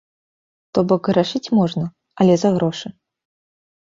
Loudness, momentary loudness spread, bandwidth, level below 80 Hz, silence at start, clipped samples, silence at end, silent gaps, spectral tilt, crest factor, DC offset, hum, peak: -18 LUFS; 13 LU; 7.6 kHz; -58 dBFS; 0.75 s; under 0.1%; 0.9 s; none; -7 dB/octave; 18 dB; under 0.1%; none; -2 dBFS